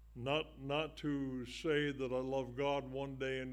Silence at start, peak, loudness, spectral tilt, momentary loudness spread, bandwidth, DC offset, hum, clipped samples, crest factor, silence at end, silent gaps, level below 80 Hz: 0 s; -22 dBFS; -39 LUFS; -6 dB/octave; 5 LU; 15.5 kHz; under 0.1%; none; under 0.1%; 16 dB; 0 s; none; -60 dBFS